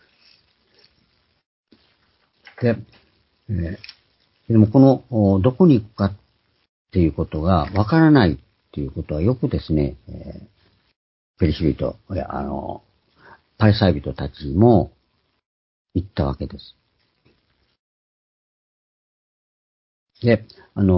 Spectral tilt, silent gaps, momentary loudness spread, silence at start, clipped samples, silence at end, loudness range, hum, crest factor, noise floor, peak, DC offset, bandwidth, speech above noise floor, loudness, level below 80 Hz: -12.5 dB/octave; 6.69-6.85 s, 10.96-11.34 s, 15.46-15.85 s, 17.79-20.07 s; 18 LU; 2.6 s; under 0.1%; 0 s; 13 LU; none; 22 dB; -67 dBFS; 0 dBFS; under 0.1%; 5.8 kHz; 49 dB; -20 LUFS; -36 dBFS